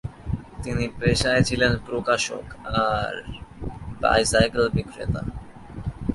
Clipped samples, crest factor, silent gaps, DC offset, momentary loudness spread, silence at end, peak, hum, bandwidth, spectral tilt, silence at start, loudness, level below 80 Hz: under 0.1%; 18 dB; none; under 0.1%; 16 LU; 0 s; -6 dBFS; none; 11.5 kHz; -4.5 dB/octave; 0.05 s; -23 LUFS; -38 dBFS